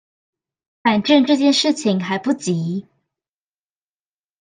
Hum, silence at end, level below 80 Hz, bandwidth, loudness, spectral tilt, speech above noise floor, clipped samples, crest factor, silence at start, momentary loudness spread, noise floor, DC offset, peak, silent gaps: none; 1.6 s; -66 dBFS; 9.6 kHz; -17 LUFS; -5 dB/octave; over 73 dB; under 0.1%; 18 dB; 0.85 s; 8 LU; under -90 dBFS; under 0.1%; -2 dBFS; none